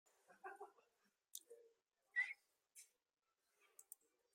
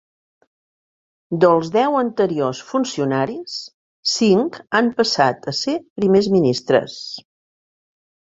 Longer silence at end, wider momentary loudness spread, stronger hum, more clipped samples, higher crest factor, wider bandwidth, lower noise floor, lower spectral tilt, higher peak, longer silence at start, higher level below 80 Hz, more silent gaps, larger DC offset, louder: second, 0.5 s vs 1.05 s; first, 24 LU vs 14 LU; neither; neither; first, 28 dB vs 18 dB; first, 16 kHz vs 8 kHz; about the same, under -90 dBFS vs under -90 dBFS; second, 1.5 dB/octave vs -5 dB/octave; second, -30 dBFS vs -2 dBFS; second, 0.3 s vs 1.3 s; second, under -90 dBFS vs -60 dBFS; second, none vs 3.74-4.03 s, 5.90-5.96 s; neither; second, -49 LUFS vs -18 LUFS